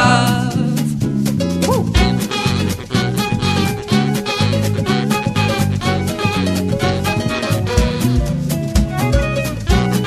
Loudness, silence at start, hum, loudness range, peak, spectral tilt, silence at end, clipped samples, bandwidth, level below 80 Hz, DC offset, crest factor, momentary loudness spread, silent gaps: -17 LUFS; 0 s; none; 1 LU; 0 dBFS; -5.5 dB/octave; 0 s; under 0.1%; 14 kHz; -26 dBFS; under 0.1%; 16 dB; 3 LU; none